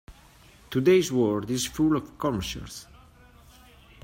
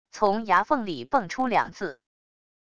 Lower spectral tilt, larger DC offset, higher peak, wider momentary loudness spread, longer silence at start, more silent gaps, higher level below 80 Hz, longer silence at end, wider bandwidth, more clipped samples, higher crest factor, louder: about the same, -5 dB/octave vs -5 dB/octave; second, under 0.1% vs 0.5%; about the same, -8 dBFS vs -6 dBFS; first, 15 LU vs 10 LU; about the same, 0.1 s vs 0.05 s; neither; first, -50 dBFS vs -60 dBFS; first, 1.2 s vs 0.65 s; first, 16 kHz vs 10 kHz; neither; about the same, 18 dB vs 20 dB; about the same, -25 LUFS vs -25 LUFS